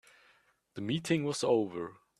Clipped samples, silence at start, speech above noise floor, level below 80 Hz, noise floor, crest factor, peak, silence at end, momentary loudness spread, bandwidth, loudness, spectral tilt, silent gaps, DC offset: under 0.1%; 0.75 s; 37 dB; -72 dBFS; -68 dBFS; 18 dB; -16 dBFS; 0.25 s; 12 LU; 13.5 kHz; -32 LUFS; -5.5 dB/octave; none; under 0.1%